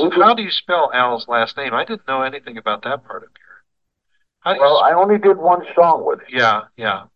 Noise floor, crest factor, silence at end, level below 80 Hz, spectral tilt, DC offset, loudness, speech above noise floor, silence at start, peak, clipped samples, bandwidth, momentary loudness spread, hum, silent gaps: -72 dBFS; 18 dB; 0.1 s; -68 dBFS; -5.5 dB/octave; 0.1%; -16 LUFS; 56 dB; 0 s; 0 dBFS; under 0.1%; 7 kHz; 12 LU; none; none